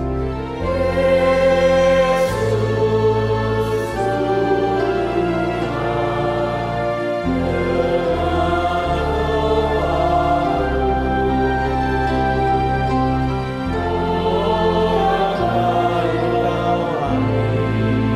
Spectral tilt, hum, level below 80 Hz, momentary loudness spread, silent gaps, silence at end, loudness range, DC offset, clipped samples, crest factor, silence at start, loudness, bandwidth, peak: -7 dB/octave; none; -30 dBFS; 5 LU; none; 0 s; 3 LU; under 0.1%; under 0.1%; 12 dB; 0 s; -18 LUFS; 14.5 kHz; -4 dBFS